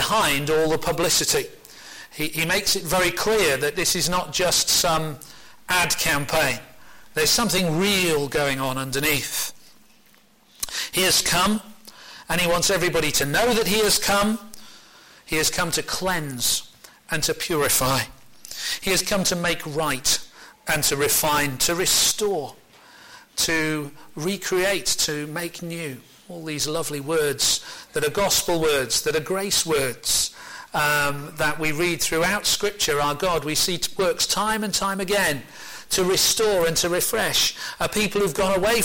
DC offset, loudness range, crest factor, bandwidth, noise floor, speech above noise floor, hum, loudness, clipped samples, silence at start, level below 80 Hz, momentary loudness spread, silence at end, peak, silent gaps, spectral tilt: under 0.1%; 4 LU; 16 dB; 17 kHz; -57 dBFS; 34 dB; none; -21 LUFS; under 0.1%; 0 s; -46 dBFS; 12 LU; 0 s; -8 dBFS; none; -2 dB/octave